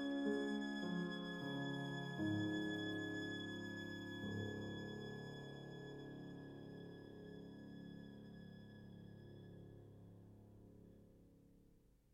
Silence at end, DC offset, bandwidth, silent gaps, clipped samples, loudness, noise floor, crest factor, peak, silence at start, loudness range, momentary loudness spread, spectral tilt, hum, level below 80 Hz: 0.25 s; under 0.1%; 16 kHz; none; under 0.1%; -47 LUFS; -71 dBFS; 18 dB; -30 dBFS; 0 s; 16 LU; 20 LU; -6 dB/octave; none; -74 dBFS